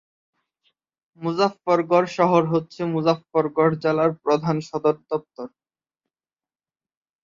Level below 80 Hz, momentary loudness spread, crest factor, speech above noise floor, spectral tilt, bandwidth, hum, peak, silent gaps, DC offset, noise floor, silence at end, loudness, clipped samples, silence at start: -66 dBFS; 10 LU; 20 dB; over 69 dB; -7 dB/octave; 7.6 kHz; none; -4 dBFS; none; under 0.1%; under -90 dBFS; 1.75 s; -22 LUFS; under 0.1%; 1.2 s